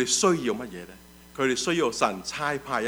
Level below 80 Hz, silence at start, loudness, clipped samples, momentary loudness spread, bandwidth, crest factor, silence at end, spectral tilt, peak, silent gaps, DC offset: -58 dBFS; 0 s; -26 LUFS; under 0.1%; 19 LU; over 20 kHz; 18 dB; 0 s; -3 dB/octave; -8 dBFS; none; under 0.1%